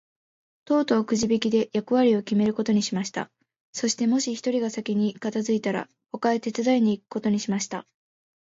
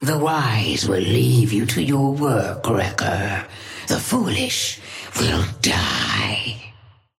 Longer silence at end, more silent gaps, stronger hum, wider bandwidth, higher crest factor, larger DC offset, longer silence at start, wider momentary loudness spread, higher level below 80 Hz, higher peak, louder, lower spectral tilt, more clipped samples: first, 0.7 s vs 0.5 s; first, 3.60-3.73 s vs none; neither; second, 7.8 kHz vs 16.5 kHz; about the same, 16 dB vs 16 dB; neither; first, 0.7 s vs 0 s; about the same, 9 LU vs 9 LU; second, -66 dBFS vs -44 dBFS; second, -8 dBFS vs -4 dBFS; second, -25 LUFS vs -20 LUFS; about the same, -5 dB/octave vs -4.5 dB/octave; neither